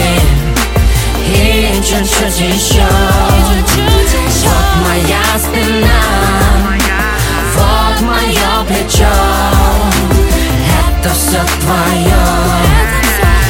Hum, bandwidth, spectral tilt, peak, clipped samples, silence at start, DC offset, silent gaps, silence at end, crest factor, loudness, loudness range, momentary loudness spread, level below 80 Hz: none; 17.5 kHz; -4 dB/octave; 0 dBFS; under 0.1%; 0 s; under 0.1%; none; 0 s; 10 dB; -10 LUFS; 1 LU; 2 LU; -14 dBFS